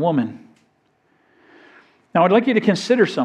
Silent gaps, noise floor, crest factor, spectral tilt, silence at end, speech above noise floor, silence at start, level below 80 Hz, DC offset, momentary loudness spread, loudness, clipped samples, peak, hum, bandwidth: none; -63 dBFS; 18 dB; -6 dB/octave; 0 s; 46 dB; 0 s; -72 dBFS; under 0.1%; 8 LU; -18 LUFS; under 0.1%; -2 dBFS; none; 10.5 kHz